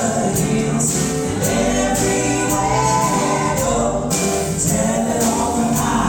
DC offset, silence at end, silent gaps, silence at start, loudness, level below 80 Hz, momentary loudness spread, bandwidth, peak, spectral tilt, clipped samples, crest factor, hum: under 0.1%; 0 s; none; 0 s; -17 LUFS; -34 dBFS; 2 LU; 19.5 kHz; -6 dBFS; -4.5 dB/octave; under 0.1%; 10 dB; none